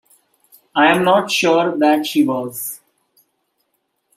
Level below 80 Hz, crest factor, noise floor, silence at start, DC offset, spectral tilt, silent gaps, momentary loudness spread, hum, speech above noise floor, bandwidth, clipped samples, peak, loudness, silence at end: -66 dBFS; 16 dB; -70 dBFS; 0.75 s; under 0.1%; -4 dB/octave; none; 13 LU; none; 54 dB; 16 kHz; under 0.1%; -2 dBFS; -16 LUFS; 1.4 s